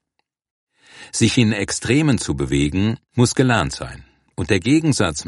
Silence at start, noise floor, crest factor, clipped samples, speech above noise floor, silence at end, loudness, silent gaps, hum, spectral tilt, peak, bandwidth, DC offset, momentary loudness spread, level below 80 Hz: 0.95 s; -74 dBFS; 18 dB; under 0.1%; 56 dB; 0 s; -18 LUFS; none; none; -5 dB/octave; -2 dBFS; 11.5 kHz; under 0.1%; 11 LU; -40 dBFS